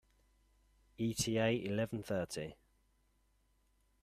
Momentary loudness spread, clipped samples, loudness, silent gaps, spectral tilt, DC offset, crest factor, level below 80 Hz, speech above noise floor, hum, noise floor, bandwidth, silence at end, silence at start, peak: 10 LU; under 0.1%; -37 LUFS; none; -4.5 dB/octave; under 0.1%; 20 dB; -66 dBFS; 38 dB; none; -75 dBFS; 15 kHz; 1.5 s; 1 s; -20 dBFS